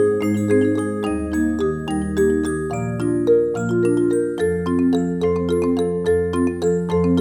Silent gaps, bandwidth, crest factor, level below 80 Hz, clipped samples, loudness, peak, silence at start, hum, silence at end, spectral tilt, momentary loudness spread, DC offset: none; 13 kHz; 12 dB; -40 dBFS; under 0.1%; -20 LUFS; -6 dBFS; 0 s; none; 0 s; -7.5 dB/octave; 5 LU; under 0.1%